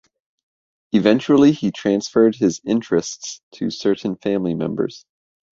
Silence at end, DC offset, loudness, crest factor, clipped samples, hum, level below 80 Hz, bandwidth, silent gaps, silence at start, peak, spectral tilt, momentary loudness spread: 0.6 s; under 0.1%; -19 LUFS; 18 dB; under 0.1%; none; -58 dBFS; 7.8 kHz; 3.43-3.51 s; 0.95 s; -2 dBFS; -5.5 dB/octave; 13 LU